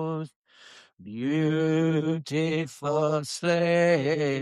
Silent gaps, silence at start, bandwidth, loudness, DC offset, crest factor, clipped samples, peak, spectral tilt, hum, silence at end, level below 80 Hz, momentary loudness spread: 0.36-0.44 s, 0.93-0.97 s; 0 s; 12.5 kHz; -26 LUFS; under 0.1%; 16 dB; under 0.1%; -10 dBFS; -6 dB/octave; none; 0 s; -70 dBFS; 11 LU